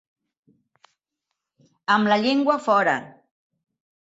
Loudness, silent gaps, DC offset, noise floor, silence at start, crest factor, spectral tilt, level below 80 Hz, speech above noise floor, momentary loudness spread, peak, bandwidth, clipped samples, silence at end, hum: -20 LUFS; none; under 0.1%; -82 dBFS; 1.9 s; 18 dB; -5 dB/octave; -72 dBFS; 62 dB; 7 LU; -6 dBFS; 8 kHz; under 0.1%; 0.95 s; none